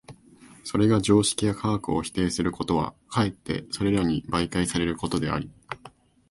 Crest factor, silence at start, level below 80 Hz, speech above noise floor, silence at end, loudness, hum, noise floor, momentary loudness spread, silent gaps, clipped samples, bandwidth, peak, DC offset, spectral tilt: 20 dB; 0.1 s; -46 dBFS; 27 dB; 0.4 s; -25 LUFS; none; -52 dBFS; 11 LU; none; under 0.1%; 11.5 kHz; -6 dBFS; under 0.1%; -5 dB/octave